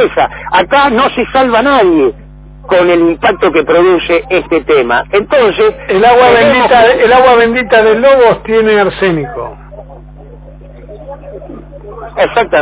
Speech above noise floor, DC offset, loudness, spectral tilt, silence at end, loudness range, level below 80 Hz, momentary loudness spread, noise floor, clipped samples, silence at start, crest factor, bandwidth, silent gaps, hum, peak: 23 dB; under 0.1%; -8 LUFS; -9 dB/octave; 0 s; 10 LU; -34 dBFS; 18 LU; -31 dBFS; 0.5%; 0 s; 10 dB; 4 kHz; none; 50 Hz at -35 dBFS; 0 dBFS